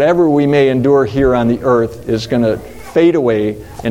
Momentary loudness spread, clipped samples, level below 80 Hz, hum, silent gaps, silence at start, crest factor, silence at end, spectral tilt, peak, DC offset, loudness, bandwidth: 8 LU; under 0.1%; -36 dBFS; none; none; 0 s; 12 dB; 0 s; -7.5 dB/octave; 0 dBFS; under 0.1%; -13 LUFS; 16 kHz